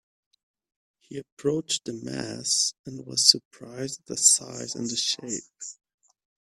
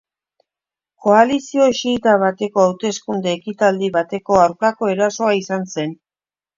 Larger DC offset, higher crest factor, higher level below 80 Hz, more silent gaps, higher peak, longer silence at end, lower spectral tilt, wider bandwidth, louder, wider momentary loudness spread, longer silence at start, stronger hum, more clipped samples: neither; first, 28 dB vs 18 dB; second, -70 dBFS vs -56 dBFS; first, 1.32-1.37 s, 2.79-2.84 s, 3.45-3.51 s vs none; about the same, -2 dBFS vs 0 dBFS; about the same, 0.7 s vs 0.65 s; second, -1.5 dB/octave vs -5 dB/octave; first, 15.5 kHz vs 7.6 kHz; second, -24 LUFS vs -17 LUFS; first, 22 LU vs 9 LU; about the same, 1.1 s vs 1 s; neither; neither